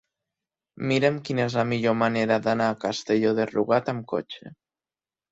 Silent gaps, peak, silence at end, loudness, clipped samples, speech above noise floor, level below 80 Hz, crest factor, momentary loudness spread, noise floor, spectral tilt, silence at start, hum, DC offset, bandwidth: none; -6 dBFS; 0.8 s; -24 LUFS; under 0.1%; over 66 dB; -64 dBFS; 18 dB; 9 LU; under -90 dBFS; -6 dB/octave; 0.8 s; none; under 0.1%; 8 kHz